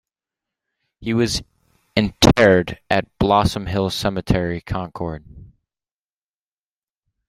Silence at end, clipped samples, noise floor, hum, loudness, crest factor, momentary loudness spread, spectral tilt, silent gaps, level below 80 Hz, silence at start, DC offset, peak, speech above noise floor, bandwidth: 1.8 s; under 0.1%; under -90 dBFS; none; -19 LUFS; 22 dB; 14 LU; -5 dB/octave; none; -38 dBFS; 1 s; under 0.1%; 0 dBFS; over 71 dB; 16 kHz